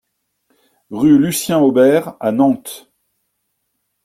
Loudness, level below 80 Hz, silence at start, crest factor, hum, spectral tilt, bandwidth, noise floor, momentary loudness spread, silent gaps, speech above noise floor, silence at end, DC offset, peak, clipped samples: -14 LUFS; -56 dBFS; 0.9 s; 14 dB; none; -5.5 dB/octave; 16 kHz; -71 dBFS; 19 LU; none; 57 dB; 1.25 s; under 0.1%; -2 dBFS; under 0.1%